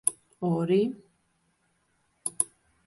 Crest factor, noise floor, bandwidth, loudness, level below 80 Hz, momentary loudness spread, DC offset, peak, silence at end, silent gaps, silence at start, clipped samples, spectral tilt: 24 dB; -72 dBFS; 12 kHz; -29 LUFS; -72 dBFS; 11 LU; under 0.1%; -6 dBFS; 0.4 s; none; 0.05 s; under 0.1%; -5 dB/octave